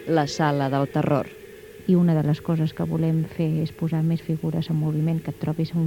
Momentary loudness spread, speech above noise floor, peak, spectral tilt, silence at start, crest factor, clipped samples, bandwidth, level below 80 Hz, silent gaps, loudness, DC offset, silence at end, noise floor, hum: 6 LU; 20 dB; -6 dBFS; -8 dB/octave; 0 s; 16 dB; under 0.1%; 16 kHz; -54 dBFS; none; -24 LUFS; under 0.1%; 0 s; -43 dBFS; none